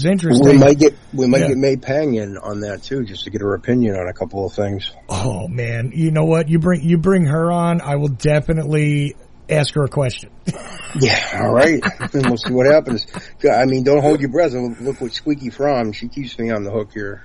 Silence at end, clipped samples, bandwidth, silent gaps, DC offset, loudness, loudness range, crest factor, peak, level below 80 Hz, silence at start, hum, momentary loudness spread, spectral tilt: 0 s; under 0.1%; 11.5 kHz; none; under 0.1%; -17 LUFS; 6 LU; 16 dB; -2 dBFS; -40 dBFS; 0 s; none; 12 LU; -6.5 dB/octave